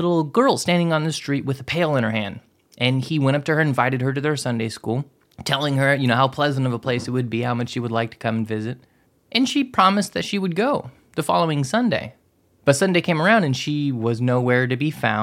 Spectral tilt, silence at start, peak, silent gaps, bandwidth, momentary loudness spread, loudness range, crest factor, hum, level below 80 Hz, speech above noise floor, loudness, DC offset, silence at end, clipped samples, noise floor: -5.5 dB/octave; 0 s; -2 dBFS; none; 15.5 kHz; 9 LU; 2 LU; 18 dB; none; -60 dBFS; 39 dB; -21 LUFS; under 0.1%; 0 s; under 0.1%; -60 dBFS